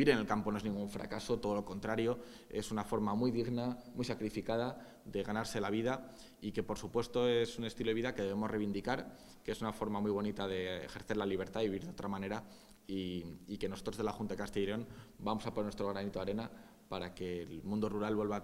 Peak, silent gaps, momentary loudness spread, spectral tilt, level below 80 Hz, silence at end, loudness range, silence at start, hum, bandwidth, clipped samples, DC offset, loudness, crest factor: -14 dBFS; none; 9 LU; -6 dB/octave; -60 dBFS; 0 s; 4 LU; 0 s; none; 16 kHz; under 0.1%; under 0.1%; -38 LUFS; 24 dB